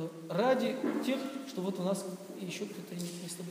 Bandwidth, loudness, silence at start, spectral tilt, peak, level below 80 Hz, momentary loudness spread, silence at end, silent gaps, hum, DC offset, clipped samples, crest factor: 15.5 kHz; -35 LUFS; 0 s; -5 dB/octave; -16 dBFS; -90 dBFS; 11 LU; 0 s; none; none; under 0.1%; under 0.1%; 18 dB